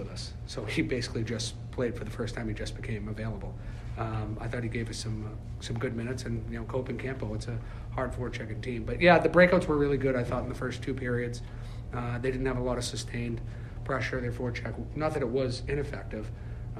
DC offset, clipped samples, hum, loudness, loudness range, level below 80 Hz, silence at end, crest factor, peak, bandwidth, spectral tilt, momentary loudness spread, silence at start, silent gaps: under 0.1%; under 0.1%; none; -31 LUFS; 9 LU; -42 dBFS; 0 s; 24 dB; -8 dBFS; 12.5 kHz; -6 dB/octave; 13 LU; 0 s; none